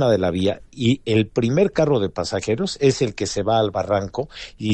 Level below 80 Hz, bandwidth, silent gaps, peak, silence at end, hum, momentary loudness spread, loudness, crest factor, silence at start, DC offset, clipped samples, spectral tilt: -48 dBFS; 10.5 kHz; none; -4 dBFS; 0 s; none; 6 LU; -21 LUFS; 16 dB; 0 s; under 0.1%; under 0.1%; -6 dB/octave